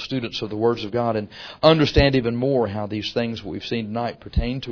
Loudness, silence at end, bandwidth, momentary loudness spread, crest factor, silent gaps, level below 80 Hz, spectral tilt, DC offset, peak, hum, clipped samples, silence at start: -22 LUFS; 0 s; 5.4 kHz; 11 LU; 22 dB; none; -34 dBFS; -7 dB/octave; under 0.1%; 0 dBFS; none; under 0.1%; 0 s